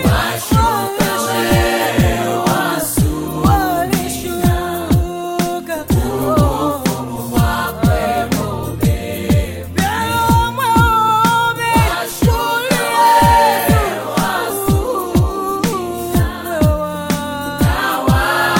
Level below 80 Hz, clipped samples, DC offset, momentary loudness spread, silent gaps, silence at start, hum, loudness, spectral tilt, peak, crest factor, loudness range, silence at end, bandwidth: -26 dBFS; under 0.1%; under 0.1%; 7 LU; none; 0 s; none; -15 LUFS; -5 dB/octave; 0 dBFS; 14 dB; 4 LU; 0 s; 17 kHz